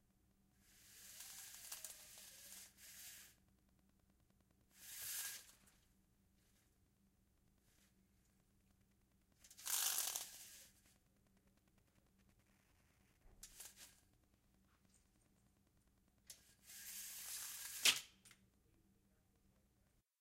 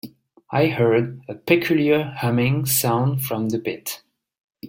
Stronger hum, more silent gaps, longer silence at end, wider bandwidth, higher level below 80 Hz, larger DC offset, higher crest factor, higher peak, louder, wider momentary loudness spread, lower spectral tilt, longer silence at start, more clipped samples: neither; second, none vs 4.40-4.48 s; first, 1.85 s vs 0 s; about the same, 16 kHz vs 17 kHz; second, -80 dBFS vs -58 dBFS; neither; first, 34 dB vs 20 dB; second, -18 dBFS vs -2 dBFS; second, -43 LUFS vs -21 LUFS; first, 24 LU vs 12 LU; second, 2 dB/octave vs -5.5 dB/octave; first, 0.65 s vs 0.05 s; neither